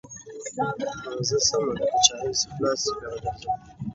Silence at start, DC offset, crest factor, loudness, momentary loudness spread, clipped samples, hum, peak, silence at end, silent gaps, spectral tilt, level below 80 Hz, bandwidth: 0.05 s; under 0.1%; 26 dB; -25 LUFS; 13 LU; under 0.1%; none; 0 dBFS; 0 s; none; -2.5 dB/octave; -54 dBFS; 8.2 kHz